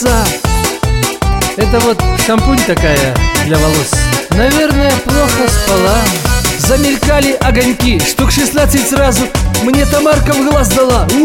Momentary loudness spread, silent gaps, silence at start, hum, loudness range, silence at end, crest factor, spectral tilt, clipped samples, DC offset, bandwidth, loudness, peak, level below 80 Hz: 3 LU; none; 0 s; none; 1 LU; 0 s; 10 dB; -4.5 dB/octave; under 0.1%; under 0.1%; 17 kHz; -11 LUFS; 0 dBFS; -18 dBFS